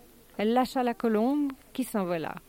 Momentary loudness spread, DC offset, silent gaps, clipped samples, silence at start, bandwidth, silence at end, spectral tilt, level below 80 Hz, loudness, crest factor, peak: 7 LU; under 0.1%; none; under 0.1%; 0.4 s; 17 kHz; 0.1 s; -6 dB/octave; -60 dBFS; -28 LUFS; 16 dB; -12 dBFS